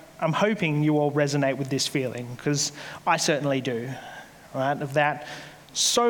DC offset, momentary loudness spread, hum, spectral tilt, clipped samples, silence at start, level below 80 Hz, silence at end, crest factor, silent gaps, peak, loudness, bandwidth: under 0.1%; 13 LU; none; -4 dB/octave; under 0.1%; 0 s; -66 dBFS; 0 s; 18 dB; none; -8 dBFS; -25 LUFS; 19.5 kHz